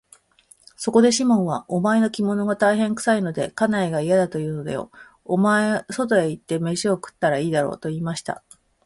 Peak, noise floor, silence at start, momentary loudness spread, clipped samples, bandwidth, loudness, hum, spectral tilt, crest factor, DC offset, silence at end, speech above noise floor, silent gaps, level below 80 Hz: -4 dBFS; -56 dBFS; 0.8 s; 10 LU; under 0.1%; 11.5 kHz; -21 LUFS; none; -5.5 dB/octave; 18 dB; under 0.1%; 0.5 s; 35 dB; none; -60 dBFS